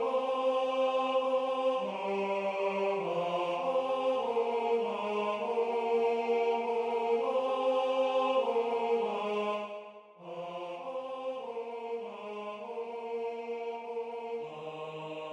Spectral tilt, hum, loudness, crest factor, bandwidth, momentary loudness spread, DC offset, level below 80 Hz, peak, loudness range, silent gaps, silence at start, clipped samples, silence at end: -5 dB/octave; none; -32 LUFS; 14 dB; 9.8 kHz; 11 LU; under 0.1%; -86 dBFS; -18 dBFS; 9 LU; none; 0 s; under 0.1%; 0 s